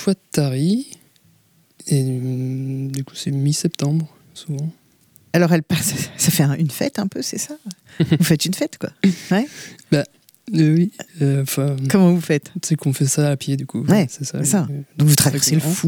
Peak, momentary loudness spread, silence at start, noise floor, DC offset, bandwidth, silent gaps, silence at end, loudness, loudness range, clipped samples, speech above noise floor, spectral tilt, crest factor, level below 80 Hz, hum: -2 dBFS; 12 LU; 0 s; -57 dBFS; under 0.1%; over 20 kHz; none; 0 s; -19 LUFS; 5 LU; under 0.1%; 38 dB; -5 dB/octave; 18 dB; -58 dBFS; none